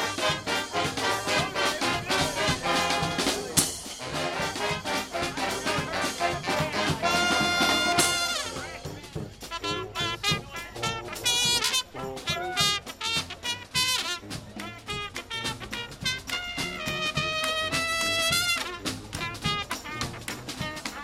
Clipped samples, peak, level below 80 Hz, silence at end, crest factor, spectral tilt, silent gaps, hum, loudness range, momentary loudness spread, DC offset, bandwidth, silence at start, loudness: under 0.1%; -6 dBFS; -50 dBFS; 0 s; 22 dB; -2 dB/octave; none; none; 5 LU; 11 LU; under 0.1%; 16 kHz; 0 s; -27 LUFS